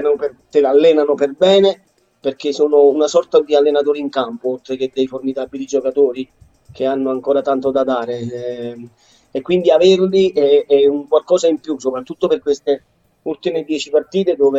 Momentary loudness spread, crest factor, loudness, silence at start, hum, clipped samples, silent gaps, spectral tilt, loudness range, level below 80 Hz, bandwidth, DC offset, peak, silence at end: 13 LU; 14 dB; -16 LUFS; 0 s; none; under 0.1%; none; -5.5 dB/octave; 5 LU; -60 dBFS; 8 kHz; under 0.1%; -2 dBFS; 0 s